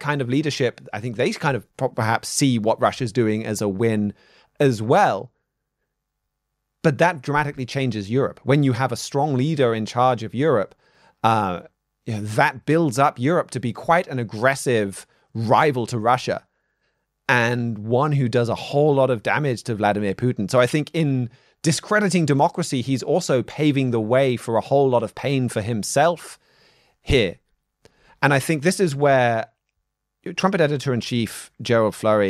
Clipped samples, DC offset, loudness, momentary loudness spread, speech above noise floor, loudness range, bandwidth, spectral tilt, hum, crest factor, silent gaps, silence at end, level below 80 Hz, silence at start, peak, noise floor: under 0.1%; under 0.1%; -21 LUFS; 9 LU; 58 dB; 2 LU; 14.5 kHz; -5.5 dB/octave; none; 20 dB; none; 0 s; -50 dBFS; 0 s; -2 dBFS; -78 dBFS